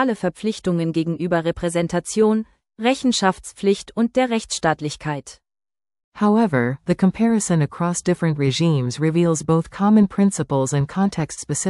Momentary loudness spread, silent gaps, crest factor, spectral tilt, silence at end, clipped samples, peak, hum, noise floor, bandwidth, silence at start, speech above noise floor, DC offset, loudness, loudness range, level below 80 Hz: 6 LU; 6.04-6.12 s; 16 dB; -5.5 dB/octave; 0 s; under 0.1%; -4 dBFS; none; under -90 dBFS; 12 kHz; 0 s; over 71 dB; under 0.1%; -20 LUFS; 3 LU; -50 dBFS